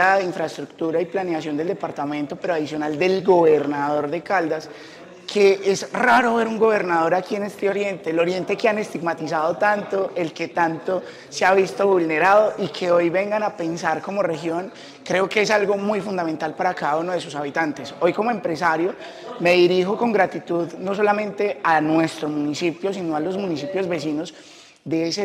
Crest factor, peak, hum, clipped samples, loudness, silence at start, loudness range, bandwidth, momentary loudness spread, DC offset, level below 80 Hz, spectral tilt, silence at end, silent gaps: 16 dB; -4 dBFS; none; under 0.1%; -21 LUFS; 0 s; 3 LU; 13.5 kHz; 10 LU; under 0.1%; -68 dBFS; -5 dB/octave; 0 s; none